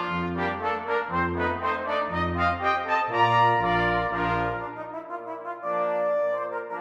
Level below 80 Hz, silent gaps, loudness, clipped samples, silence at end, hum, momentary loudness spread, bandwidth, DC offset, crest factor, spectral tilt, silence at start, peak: -48 dBFS; none; -26 LUFS; under 0.1%; 0 s; none; 13 LU; 8.6 kHz; under 0.1%; 16 dB; -7 dB/octave; 0 s; -10 dBFS